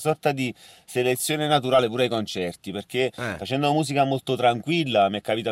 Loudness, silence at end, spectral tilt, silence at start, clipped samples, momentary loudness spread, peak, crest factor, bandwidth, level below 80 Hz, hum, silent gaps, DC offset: -24 LUFS; 0 s; -4.5 dB/octave; 0 s; under 0.1%; 9 LU; -8 dBFS; 16 dB; 16 kHz; -64 dBFS; none; none; under 0.1%